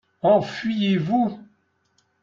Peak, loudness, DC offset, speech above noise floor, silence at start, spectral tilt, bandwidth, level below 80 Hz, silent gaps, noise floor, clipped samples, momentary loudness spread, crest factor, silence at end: -6 dBFS; -22 LUFS; under 0.1%; 47 dB; 0.25 s; -7.5 dB/octave; 7.4 kHz; -64 dBFS; none; -67 dBFS; under 0.1%; 7 LU; 18 dB; 0.8 s